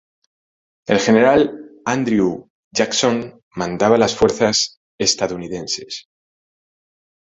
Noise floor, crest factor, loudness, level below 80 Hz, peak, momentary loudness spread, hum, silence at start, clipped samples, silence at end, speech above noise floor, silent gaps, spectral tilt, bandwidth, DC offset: under -90 dBFS; 18 dB; -18 LUFS; -50 dBFS; -2 dBFS; 13 LU; none; 0.9 s; under 0.1%; 1.3 s; over 73 dB; 2.50-2.71 s, 3.43-3.51 s, 4.77-4.98 s; -3.5 dB/octave; 8.4 kHz; under 0.1%